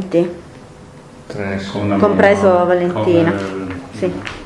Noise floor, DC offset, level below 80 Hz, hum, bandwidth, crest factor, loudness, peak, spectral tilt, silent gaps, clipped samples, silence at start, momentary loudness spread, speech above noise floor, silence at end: -38 dBFS; under 0.1%; -48 dBFS; none; 11.5 kHz; 16 dB; -16 LUFS; 0 dBFS; -7 dB/octave; none; under 0.1%; 0 s; 15 LU; 23 dB; 0 s